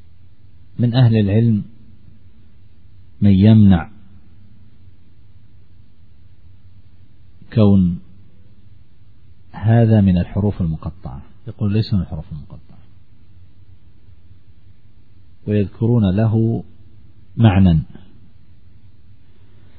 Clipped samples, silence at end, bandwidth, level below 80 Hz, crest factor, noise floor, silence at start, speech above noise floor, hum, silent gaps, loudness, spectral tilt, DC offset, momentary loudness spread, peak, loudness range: under 0.1%; 1.95 s; 4.8 kHz; -40 dBFS; 18 dB; -50 dBFS; 0.8 s; 35 dB; none; none; -16 LUFS; -12 dB/octave; 1%; 23 LU; 0 dBFS; 9 LU